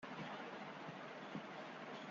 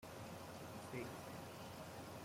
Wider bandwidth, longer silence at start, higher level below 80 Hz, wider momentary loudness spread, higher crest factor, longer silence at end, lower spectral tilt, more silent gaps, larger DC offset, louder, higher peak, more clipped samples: second, 7.4 kHz vs 16.5 kHz; about the same, 0 s vs 0 s; second, -88 dBFS vs -74 dBFS; about the same, 2 LU vs 3 LU; about the same, 14 dB vs 16 dB; about the same, 0 s vs 0 s; second, -3.5 dB/octave vs -5 dB/octave; neither; neither; about the same, -50 LUFS vs -52 LUFS; about the same, -36 dBFS vs -36 dBFS; neither